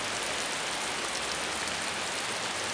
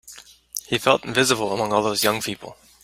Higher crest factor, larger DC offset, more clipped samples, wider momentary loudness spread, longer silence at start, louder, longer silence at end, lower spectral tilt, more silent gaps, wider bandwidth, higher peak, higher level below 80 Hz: second, 16 dB vs 22 dB; neither; neither; second, 1 LU vs 16 LU; about the same, 0 s vs 0.05 s; second, -31 LUFS vs -21 LUFS; second, 0 s vs 0.3 s; second, -0.5 dB/octave vs -3 dB/octave; neither; second, 10.5 kHz vs 16.5 kHz; second, -16 dBFS vs -2 dBFS; about the same, -60 dBFS vs -58 dBFS